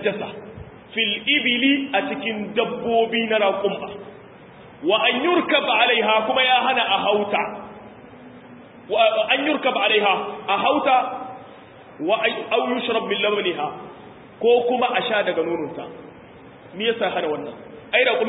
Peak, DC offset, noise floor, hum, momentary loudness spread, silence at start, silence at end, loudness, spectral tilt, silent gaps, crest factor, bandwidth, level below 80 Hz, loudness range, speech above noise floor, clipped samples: -4 dBFS; under 0.1%; -44 dBFS; none; 18 LU; 0 s; 0 s; -20 LUFS; -8.5 dB/octave; none; 18 dB; 4 kHz; -62 dBFS; 5 LU; 23 dB; under 0.1%